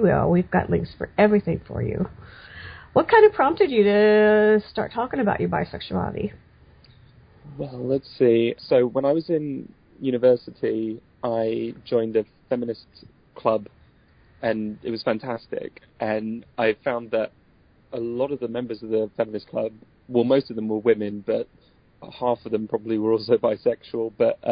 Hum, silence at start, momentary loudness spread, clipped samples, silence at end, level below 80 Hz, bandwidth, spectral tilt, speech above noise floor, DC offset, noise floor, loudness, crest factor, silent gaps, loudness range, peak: none; 0 s; 14 LU; under 0.1%; 0 s; -50 dBFS; 5.2 kHz; -11.5 dB/octave; 35 dB; under 0.1%; -57 dBFS; -23 LUFS; 18 dB; none; 9 LU; -4 dBFS